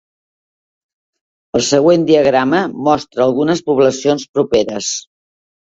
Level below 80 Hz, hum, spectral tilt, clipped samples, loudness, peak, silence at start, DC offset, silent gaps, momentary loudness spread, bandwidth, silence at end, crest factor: -52 dBFS; none; -4.5 dB/octave; under 0.1%; -14 LUFS; 0 dBFS; 1.55 s; under 0.1%; 4.29-4.34 s; 8 LU; 8 kHz; 0.75 s; 16 dB